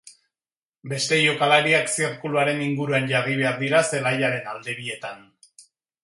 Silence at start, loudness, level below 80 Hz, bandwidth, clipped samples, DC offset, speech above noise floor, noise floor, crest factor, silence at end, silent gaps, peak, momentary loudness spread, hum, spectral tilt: 0.05 s; -22 LUFS; -70 dBFS; 11.5 kHz; under 0.1%; under 0.1%; over 68 dB; under -90 dBFS; 20 dB; 0.4 s; 0.63-0.70 s; -4 dBFS; 13 LU; none; -4 dB/octave